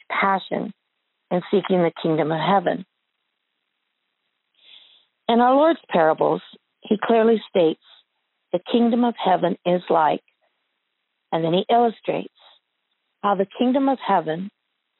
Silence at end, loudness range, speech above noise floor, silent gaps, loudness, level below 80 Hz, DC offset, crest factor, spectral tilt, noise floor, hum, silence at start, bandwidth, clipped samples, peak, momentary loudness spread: 0.5 s; 5 LU; 56 dB; none; -21 LUFS; -74 dBFS; under 0.1%; 16 dB; -4.5 dB/octave; -76 dBFS; none; 0.1 s; 4.2 kHz; under 0.1%; -6 dBFS; 11 LU